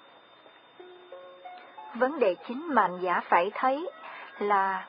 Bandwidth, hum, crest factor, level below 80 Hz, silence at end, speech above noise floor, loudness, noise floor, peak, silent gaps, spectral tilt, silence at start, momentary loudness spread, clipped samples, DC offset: 5.2 kHz; none; 22 dB; -82 dBFS; 0 s; 28 dB; -27 LUFS; -55 dBFS; -8 dBFS; none; -8.5 dB/octave; 0.8 s; 21 LU; under 0.1%; under 0.1%